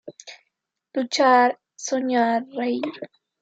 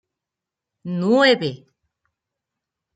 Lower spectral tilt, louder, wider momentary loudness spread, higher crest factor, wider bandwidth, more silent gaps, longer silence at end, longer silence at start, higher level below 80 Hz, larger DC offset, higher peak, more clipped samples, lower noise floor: second, -2.5 dB/octave vs -5.5 dB/octave; second, -22 LUFS vs -18 LUFS; first, 23 LU vs 15 LU; about the same, 20 dB vs 20 dB; about the same, 9 kHz vs 9.2 kHz; neither; second, 0.35 s vs 1.4 s; second, 0.05 s vs 0.85 s; second, -82 dBFS vs -70 dBFS; neither; about the same, -4 dBFS vs -4 dBFS; neither; second, -79 dBFS vs -86 dBFS